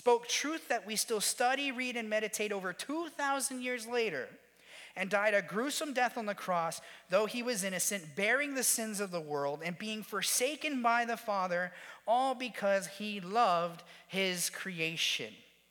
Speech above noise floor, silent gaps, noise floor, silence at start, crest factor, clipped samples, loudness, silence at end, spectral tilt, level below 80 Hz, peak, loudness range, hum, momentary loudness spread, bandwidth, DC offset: 21 dB; none; -55 dBFS; 0 s; 18 dB; under 0.1%; -33 LUFS; 0.3 s; -2 dB/octave; -86 dBFS; -16 dBFS; 2 LU; none; 9 LU; 19 kHz; under 0.1%